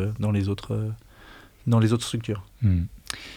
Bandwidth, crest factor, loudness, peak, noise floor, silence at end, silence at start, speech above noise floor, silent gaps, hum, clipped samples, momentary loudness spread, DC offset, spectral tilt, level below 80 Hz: 14 kHz; 18 dB; -26 LUFS; -8 dBFS; -49 dBFS; 0 s; 0 s; 25 dB; none; none; under 0.1%; 12 LU; under 0.1%; -6.5 dB/octave; -48 dBFS